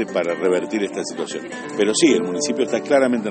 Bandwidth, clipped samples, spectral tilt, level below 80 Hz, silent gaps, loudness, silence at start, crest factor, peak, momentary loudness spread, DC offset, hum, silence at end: 8.8 kHz; under 0.1%; -3.5 dB/octave; -64 dBFS; none; -20 LUFS; 0 s; 16 dB; -2 dBFS; 11 LU; under 0.1%; none; 0 s